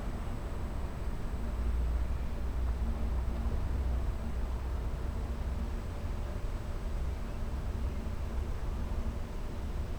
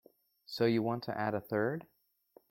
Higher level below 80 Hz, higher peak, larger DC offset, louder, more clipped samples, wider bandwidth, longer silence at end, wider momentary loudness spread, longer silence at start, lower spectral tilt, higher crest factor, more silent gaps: first, -34 dBFS vs -74 dBFS; second, -22 dBFS vs -18 dBFS; neither; second, -38 LUFS vs -34 LUFS; neither; second, 13 kHz vs 16.5 kHz; second, 0 s vs 0.7 s; second, 5 LU vs 10 LU; second, 0 s vs 0.5 s; about the same, -7 dB/octave vs -7.5 dB/octave; second, 12 dB vs 18 dB; neither